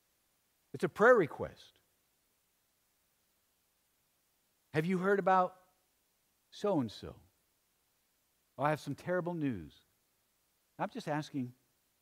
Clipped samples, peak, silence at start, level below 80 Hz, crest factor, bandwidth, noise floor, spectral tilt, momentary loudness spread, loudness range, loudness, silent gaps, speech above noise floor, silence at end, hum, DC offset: under 0.1%; -14 dBFS; 0.75 s; -72 dBFS; 24 dB; 16 kHz; -77 dBFS; -7 dB/octave; 17 LU; 7 LU; -33 LUFS; none; 44 dB; 0.5 s; none; under 0.1%